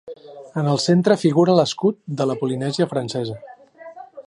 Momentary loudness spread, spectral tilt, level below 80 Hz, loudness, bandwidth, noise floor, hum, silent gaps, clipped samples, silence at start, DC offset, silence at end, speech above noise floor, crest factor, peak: 22 LU; -6 dB/octave; -66 dBFS; -20 LUFS; 11 kHz; -41 dBFS; none; none; under 0.1%; 0.05 s; under 0.1%; 0.05 s; 22 dB; 18 dB; -2 dBFS